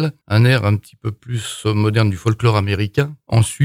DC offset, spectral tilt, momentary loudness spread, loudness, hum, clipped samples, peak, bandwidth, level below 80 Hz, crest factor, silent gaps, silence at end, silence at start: under 0.1%; -6 dB/octave; 11 LU; -18 LUFS; none; under 0.1%; -2 dBFS; 14.5 kHz; -46 dBFS; 14 dB; none; 0 s; 0 s